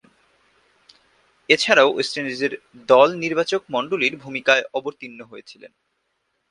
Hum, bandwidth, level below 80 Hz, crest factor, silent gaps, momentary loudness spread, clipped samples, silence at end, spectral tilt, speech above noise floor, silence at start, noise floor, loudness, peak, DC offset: none; 11.5 kHz; -68 dBFS; 22 dB; none; 21 LU; under 0.1%; 0.85 s; -3 dB/octave; 52 dB; 1.5 s; -72 dBFS; -19 LUFS; 0 dBFS; under 0.1%